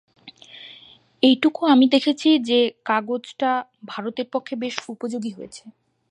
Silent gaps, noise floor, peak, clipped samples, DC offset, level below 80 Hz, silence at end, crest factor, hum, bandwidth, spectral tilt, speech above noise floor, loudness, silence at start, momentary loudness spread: none; -49 dBFS; -4 dBFS; under 0.1%; under 0.1%; -74 dBFS; 0.4 s; 18 dB; none; 10 kHz; -4 dB/octave; 29 dB; -21 LUFS; 0.25 s; 22 LU